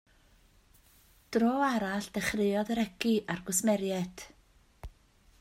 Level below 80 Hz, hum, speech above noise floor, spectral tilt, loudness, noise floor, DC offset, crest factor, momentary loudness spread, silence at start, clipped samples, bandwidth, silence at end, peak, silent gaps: -58 dBFS; none; 33 dB; -4 dB/octave; -31 LUFS; -63 dBFS; under 0.1%; 20 dB; 23 LU; 1.3 s; under 0.1%; 16 kHz; 0.55 s; -14 dBFS; none